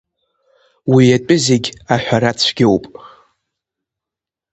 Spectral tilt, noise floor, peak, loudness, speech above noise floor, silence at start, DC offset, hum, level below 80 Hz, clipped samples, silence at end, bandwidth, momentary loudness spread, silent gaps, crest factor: -5 dB/octave; -86 dBFS; 0 dBFS; -14 LUFS; 73 dB; 0.85 s; under 0.1%; none; -50 dBFS; under 0.1%; 1.45 s; 8.8 kHz; 7 LU; none; 16 dB